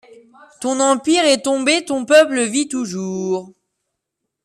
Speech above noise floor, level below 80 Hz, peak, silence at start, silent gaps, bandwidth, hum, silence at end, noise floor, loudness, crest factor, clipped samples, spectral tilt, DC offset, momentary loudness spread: 61 dB; -66 dBFS; -2 dBFS; 0.6 s; none; 13.5 kHz; none; 0.95 s; -78 dBFS; -17 LUFS; 16 dB; under 0.1%; -3 dB/octave; under 0.1%; 11 LU